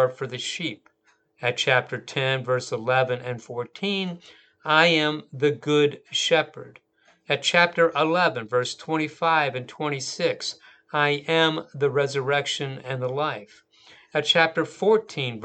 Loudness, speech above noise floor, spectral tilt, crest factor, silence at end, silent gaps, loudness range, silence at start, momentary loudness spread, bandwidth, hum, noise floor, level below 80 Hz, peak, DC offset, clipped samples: -23 LUFS; 41 dB; -4 dB/octave; 24 dB; 0 s; none; 3 LU; 0 s; 11 LU; 9.2 kHz; none; -65 dBFS; -76 dBFS; -2 dBFS; under 0.1%; under 0.1%